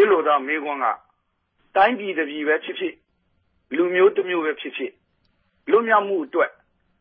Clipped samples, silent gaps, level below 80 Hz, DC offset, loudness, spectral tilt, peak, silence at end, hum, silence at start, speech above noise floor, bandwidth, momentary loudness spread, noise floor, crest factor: under 0.1%; none; -72 dBFS; under 0.1%; -21 LUFS; -9 dB/octave; -4 dBFS; 0.5 s; none; 0 s; 49 dB; 4.4 kHz; 13 LU; -70 dBFS; 18 dB